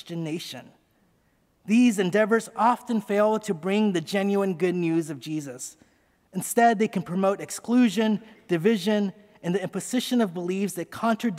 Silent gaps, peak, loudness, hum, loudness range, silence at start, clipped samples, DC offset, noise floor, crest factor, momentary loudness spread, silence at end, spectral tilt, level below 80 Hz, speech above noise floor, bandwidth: none; -8 dBFS; -25 LUFS; none; 3 LU; 0.05 s; under 0.1%; under 0.1%; -66 dBFS; 16 dB; 12 LU; 0 s; -5.5 dB/octave; -74 dBFS; 42 dB; 16 kHz